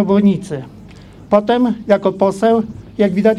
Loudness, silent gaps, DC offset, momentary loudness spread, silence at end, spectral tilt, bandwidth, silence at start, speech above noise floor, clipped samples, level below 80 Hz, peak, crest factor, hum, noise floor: -15 LUFS; none; under 0.1%; 14 LU; 0 s; -7.5 dB/octave; 11 kHz; 0 s; 24 dB; under 0.1%; -48 dBFS; 0 dBFS; 16 dB; none; -38 dBFS